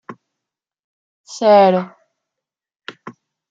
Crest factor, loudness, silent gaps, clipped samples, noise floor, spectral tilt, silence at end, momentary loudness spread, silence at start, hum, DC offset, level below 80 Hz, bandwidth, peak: 18 dB; -13 LUFS; 0.79-1.24 s; under 0.1%; -84 dBFS; -6 dB/octave; 0.4 s; 26 LU; 0.1 s; none; under 0.1%; -74 dBFS; 7.8 kHz; -2 dBFS